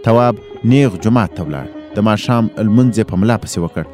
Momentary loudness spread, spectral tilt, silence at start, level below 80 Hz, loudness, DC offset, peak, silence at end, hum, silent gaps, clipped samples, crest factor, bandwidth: 10 LU; -7 dB/octave; 0 s; -42 dBFS; -15 LUFS; under 0.1%; 0 dBFS; 0 s; none; none; under 0.1%; 14 dB; 14 kHz